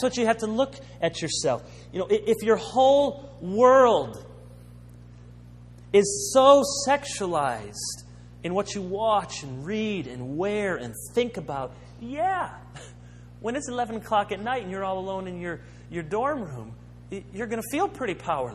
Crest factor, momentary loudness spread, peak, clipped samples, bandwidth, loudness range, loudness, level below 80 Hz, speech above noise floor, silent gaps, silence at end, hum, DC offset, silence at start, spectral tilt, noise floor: 22 dB; 18 LU; -2 dBFS; under 0.1%; 13.5 kHz; 9 LU; -25 LUFS; -52 dBFS; 21 dB; none; 0 s; 60 Hz at -45 dBFS; under 0.1%; 0 s; -4 dB/octave; -46 dBFS